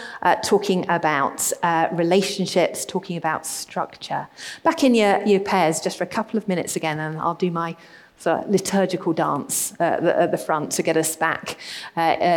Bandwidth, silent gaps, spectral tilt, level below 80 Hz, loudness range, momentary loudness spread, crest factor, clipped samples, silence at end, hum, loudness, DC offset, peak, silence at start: 19 kHz; none; -4 dB/octave; -64 dBFS; 3 LU; 9 LU; 18 dB; under 0.1%; 0 s; none; -22 LUFS; under 0.1%; -4 dBFS; 0 s